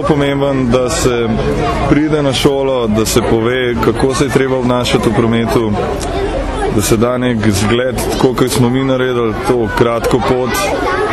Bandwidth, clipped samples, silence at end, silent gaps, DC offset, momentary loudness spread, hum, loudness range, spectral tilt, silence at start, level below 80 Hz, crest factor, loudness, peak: 14 kHz; under 0.1%; 0 s; none; under 0.1%; 3 LU; none; 1 LU; -5.5 dB/octave; 0 s; -28 dBFS; 12 dB; -13 LUFS; 0 dBFS